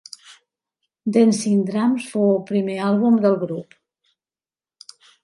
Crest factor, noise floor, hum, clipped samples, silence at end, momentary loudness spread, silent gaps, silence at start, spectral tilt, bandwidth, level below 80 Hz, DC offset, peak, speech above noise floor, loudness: 16 dB; under -90 dBFS; none; under 0.1%; 1.6 s; 13 LU; none; 1.05 s; -6.5 dB/octave; 11.5 kHz; -72 dBFS; under 0.1%; -4 dBFS; over 72 dB; -19 LUFS